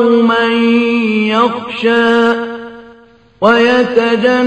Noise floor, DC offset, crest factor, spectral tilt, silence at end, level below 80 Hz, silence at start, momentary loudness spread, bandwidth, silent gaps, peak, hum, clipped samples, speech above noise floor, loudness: -43 dBFS; under 0.1%; 12 dB; -5.5 dB/octave; 0 s; -54 dBFS; 0 s; 7 LU; 8.8 kHz; none; 0 dBFS; none; under 0.1%; 33 dB; -11 LUFS